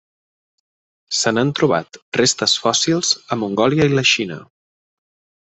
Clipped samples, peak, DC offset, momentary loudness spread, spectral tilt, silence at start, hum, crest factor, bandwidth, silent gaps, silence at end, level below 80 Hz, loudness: under 0.1%; -2 dBFS; under 0.1%; 8 LU; -3.5 dB/octave; 1.1 s; none; 18 dB; 8.4 kHz; 2.02-2.12 s; 1.1 s; -56 dBFS; -17 LUFS